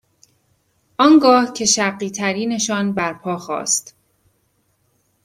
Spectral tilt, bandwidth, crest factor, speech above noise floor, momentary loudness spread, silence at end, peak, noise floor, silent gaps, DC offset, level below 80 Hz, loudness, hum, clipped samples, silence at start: -3 dB/octave; 15.5 kHz; 18 dB; 48 dB; 12 LU; 1.45 s; 0 dBFS; -65 dBFS; none; under 0.1%; -62 dBFS; -17 LUFS; none; under 0.1%; 1 s